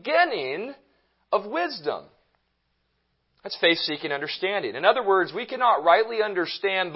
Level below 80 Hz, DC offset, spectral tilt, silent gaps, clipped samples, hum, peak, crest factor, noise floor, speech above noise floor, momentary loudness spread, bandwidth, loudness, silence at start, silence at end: -76 dBFS; under 0.1%; -7.5 dB/octave; none; under 0.1%; none; -4 dBFS; 22 dB; -73 dBFS; 49 dB; 12 LU; 5.8 kHz; -24 LUFS; 0.05 s; 0 s